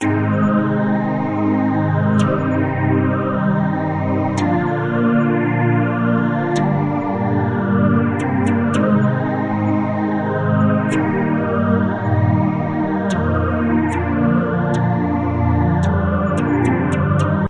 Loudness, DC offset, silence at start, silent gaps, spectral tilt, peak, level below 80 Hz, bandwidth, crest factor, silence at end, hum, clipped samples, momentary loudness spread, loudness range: -17 LUFS; under 0.1%; 0 s; none; -8.5 dB/octave; -4 dBFS; -46 dBFS; 10.5 kHz; 12 dB; 0 s; none; under 0.1%; 3 LU; 1 LU